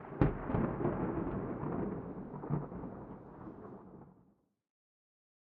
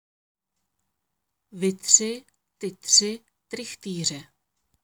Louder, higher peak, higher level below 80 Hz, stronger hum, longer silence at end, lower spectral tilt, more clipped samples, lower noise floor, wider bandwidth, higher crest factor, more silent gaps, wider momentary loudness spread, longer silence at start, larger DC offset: second, -38 LUFS vs -21 LUFS; second, -12 dBFS vs -2 dBFS; first, -52 dBFS vs -74 dBFS; neither; first, 1.35 s vs 0.6 s; first, -9.5 dB/octave vs -1.5 dB/octave; neither; second, -71 dBFS vs -81 dBFS; second, 4.3 kHz vs over 20 kHz; about the same, 28 dB vs 26 dB; neither; second, 17 LU vs 20 LU; second, 0 s vs 1.55 s; neither